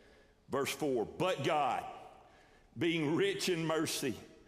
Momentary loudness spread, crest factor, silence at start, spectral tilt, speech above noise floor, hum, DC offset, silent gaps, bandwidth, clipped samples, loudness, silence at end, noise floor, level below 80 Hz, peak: 8 LU; 16 dB; 0.5 s; -4.5 dB/octave; 29 dB; none; under 0.1%; none; 15.5 kHz; under 0.1%; -34 LUFS; 0.15 s; -63 dBFS; -70 dBFS; -20 dBFS